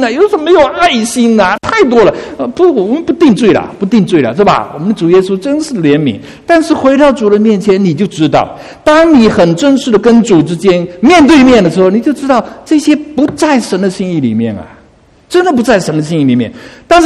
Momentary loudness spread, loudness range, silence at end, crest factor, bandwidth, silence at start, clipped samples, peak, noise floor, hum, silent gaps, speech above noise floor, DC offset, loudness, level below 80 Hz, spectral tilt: 8 LU; 5 LU; 0 s; 8 dB; 12.5 kHz; 0 s; 1%; 0 dBFS; -43 dBFS; none; none; 35 dB; under 0.1%; -9 LUFS; -38 dBFS; -6 dB/octave